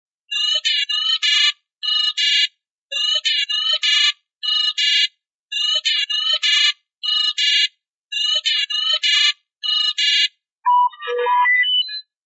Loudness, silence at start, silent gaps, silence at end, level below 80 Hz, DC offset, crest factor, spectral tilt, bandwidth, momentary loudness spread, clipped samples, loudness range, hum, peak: -16 LUFS; 0.3 s; 1.76-1.81 s, 2.70-2.90 s, 5.34-5.48 s, 7.89-8.09 s, 10.52-10.62 s; 0.25 s; under -90 dBFS; under 0.1%; 16 dB; 8.5 dB/octave; 8.2 kHz; 7 LU; under 0.1%; 1 LU; none; -4 dBFS